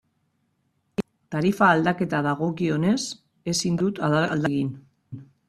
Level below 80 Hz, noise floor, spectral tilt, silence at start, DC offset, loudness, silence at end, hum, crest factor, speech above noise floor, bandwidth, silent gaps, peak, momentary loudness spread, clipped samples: -60 dBFS; -71 dBFS; -5.5 dB/octave; 1 s; under 0.1%; -24 LUFS; 0.25 s; none; 20 dB; 48 dB; 13.5 kHz; none; -4 dBFS; 15 LU; under 0.1%